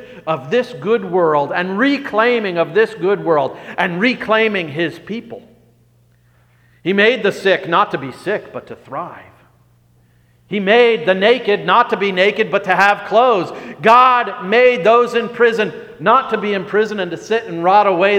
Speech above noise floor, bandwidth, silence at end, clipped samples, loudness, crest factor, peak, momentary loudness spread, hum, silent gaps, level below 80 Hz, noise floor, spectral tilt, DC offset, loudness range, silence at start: 38 dB; 11 kHz; 0 s; under 0.1%; -15 LUFS; 16 dB; 0 dBFS; 12 LU; 60 Hz at -55 dBFS; none; -62 dBFS; -53 dBFS; -5.5 dB/octave; under 0.1%; 7 LU; 0 s